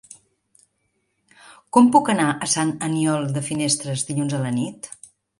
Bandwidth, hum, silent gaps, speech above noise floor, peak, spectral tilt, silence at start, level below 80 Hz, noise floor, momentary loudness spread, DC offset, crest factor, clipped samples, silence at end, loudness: 11.5 kHz; none; none; 51 dB; -2 dBFS; -4.5 dB/octave; 1.5 s; -64 dBFS; -71 dBFS; 13 LU; under 0.1%; 20 dB; under 0.1%; 0.5 s; -20 LUFS